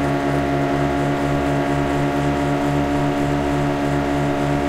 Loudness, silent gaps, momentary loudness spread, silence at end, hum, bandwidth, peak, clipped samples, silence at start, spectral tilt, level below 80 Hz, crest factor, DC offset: -20 LUFS; none; 1 LU; 0 s; none; 15.5 kHz; -6 dBFS; under 0.1%; 0 s; -7 dB/octave; -34 dBFS; 12 dB; under 0.1%